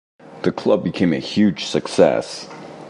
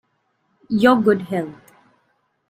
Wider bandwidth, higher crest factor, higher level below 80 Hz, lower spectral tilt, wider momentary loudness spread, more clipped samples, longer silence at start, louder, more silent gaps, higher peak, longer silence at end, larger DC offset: second, 11.5 kHz vs 16 kHz; about the same, 20 dB vs 20 dB; first, -52 dBFS vs -60 dBFS; about the same, -6 dB/octave vs -7 dB/octave; about the same, 13 LU vs 12 LU; neither; second, 0.25 s vs 0.7 s; about the same, -19 LUFS vs -18 LUFS; neither; about the same, 0 dBFS vs -2 dBFS; second, 0 s vs 0.95 s; neither